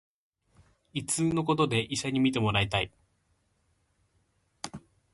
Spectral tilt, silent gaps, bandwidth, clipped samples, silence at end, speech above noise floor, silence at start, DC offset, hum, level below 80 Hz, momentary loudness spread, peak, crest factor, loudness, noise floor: -4.5 dB/octave; none; 11.5 kHz; under 0.1%; 0.35 s; 45 dB; 0.95 s; under 0.1%; none; -56 dBFS; 16 LU; -12 dBFS; 20 dB; -28 LUFS; -72 dBFS